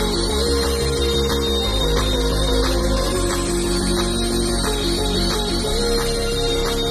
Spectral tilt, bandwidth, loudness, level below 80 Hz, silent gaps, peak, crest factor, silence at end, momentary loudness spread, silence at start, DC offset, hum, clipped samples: -4 dB/octave; 13.5 kHz; -20 LUFS; -24 dBFS; none; -6 dBFS; 12 dB; 0 s; 2 LU; 0 s; under 0.1%; none; under 0.1%